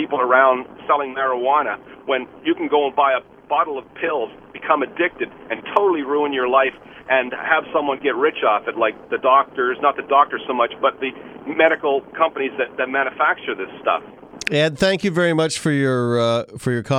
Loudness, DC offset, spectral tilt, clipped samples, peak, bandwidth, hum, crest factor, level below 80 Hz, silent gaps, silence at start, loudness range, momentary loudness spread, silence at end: -19 LUFS; under 0.1%; -5 dB/octave; under 0.1%; 0 dBFS; 13 kHz; none; 20 dB; -58 dBFS; none; 0 s; 2 LU; 8 LU; 0 s